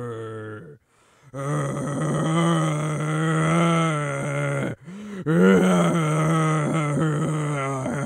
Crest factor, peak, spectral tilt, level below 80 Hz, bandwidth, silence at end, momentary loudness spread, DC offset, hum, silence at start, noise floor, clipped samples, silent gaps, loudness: 18 dB; -4 dBFS; -6.5 dB/octave; -60 dBFS; 11 kHz; 0 s; 15 LU; under 0.1%; none; 0 s; -58 dBFS; under 0.1%; none; -22 LUFS